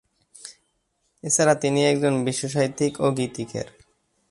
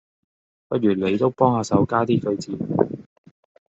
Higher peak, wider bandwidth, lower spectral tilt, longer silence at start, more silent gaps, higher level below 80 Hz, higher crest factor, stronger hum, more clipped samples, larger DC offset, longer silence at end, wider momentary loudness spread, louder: second, -6 dBFS vs -2 dBFS; first, 11.5 kHz vs 8 kHz; second, -4.5 dB/octave vs -7 dB/octave; second, 0.45 s vs 0.7 s; neither; about the same, -62 dBFS vs -60 dBFS; about the same, 20 dB vs 20 dB; neither; neither; neither; about the same, 0.65 s vs 0.65 s; first, 22 LU vs 8 LU; about the same, -22 LUFS vs -21 LUFS